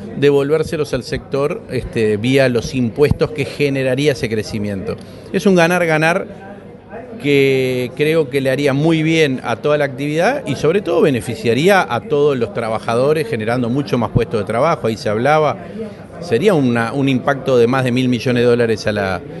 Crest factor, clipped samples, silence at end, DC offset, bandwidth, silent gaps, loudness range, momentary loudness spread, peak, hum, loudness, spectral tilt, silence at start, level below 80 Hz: 16 dB; under 0.1%; 0 s; under 0.1%; 12 kHz; none; 2 LU; 9 LU; 0 dBFS; none; -16 LUFS; -6 dB/octave; 0 s; -42 dBFS